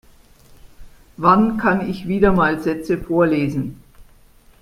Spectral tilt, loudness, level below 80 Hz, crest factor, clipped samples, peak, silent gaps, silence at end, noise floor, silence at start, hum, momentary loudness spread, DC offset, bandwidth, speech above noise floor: -8 dB/octave; -18 LUFS; -40 dBFS; 18 dB; under 0.1%; 0 dBFS; none; 0.6 s; -49 dBFS; 0.65 s; none; 8 LU; under 0.1%; 15.5 kHz; 32 dB